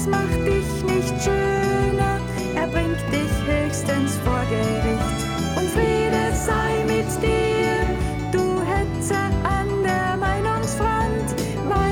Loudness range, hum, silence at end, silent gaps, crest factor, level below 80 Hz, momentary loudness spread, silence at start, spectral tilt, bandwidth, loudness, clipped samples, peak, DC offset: 1 LU; none; 0 s; none; 14 dB; -32 dBFS; 3 LU; 0 s; -5.5 dB/octave; 19.5 kHz; -22 LUFS; under 0.1%; -6 dBFS; under 0.1%